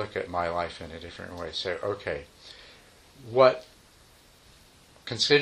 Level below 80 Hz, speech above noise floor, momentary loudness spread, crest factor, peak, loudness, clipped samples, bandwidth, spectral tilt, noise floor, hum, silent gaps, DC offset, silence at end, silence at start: -58 dBFS; 29 dB; 25 LU; 24 dB; -6 dBFS; -28 LUFS; under 0.1%; 12.5 kHz; -4 dB/octave; -56 dBFS; none; none; under 0.1%; 0 s; 0 s